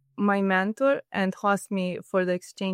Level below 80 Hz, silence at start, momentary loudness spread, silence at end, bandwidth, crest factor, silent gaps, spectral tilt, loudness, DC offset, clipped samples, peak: -74 dBFS; 0.2 s; 6 LU; 0 s; 15.5 kHz; 14 dB; none; -6 dB/octave; -26 LUFS; under 0.1%; under 0.1%; -10 dBFS